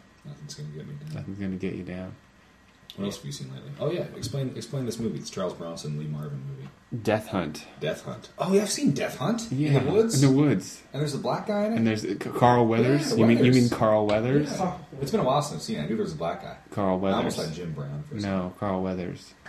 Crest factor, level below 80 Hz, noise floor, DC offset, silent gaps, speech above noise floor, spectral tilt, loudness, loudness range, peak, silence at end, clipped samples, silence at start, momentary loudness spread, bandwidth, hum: 22 dB; -54 dBFS; -56 dBFS; under 0.1%; none; 30 dB; -6 dB/octave; -26 LUFS; 12 LU; -6 dBFS; 0 s; under 0.1%; 0.25 s; 17 LU; 14 kHz; none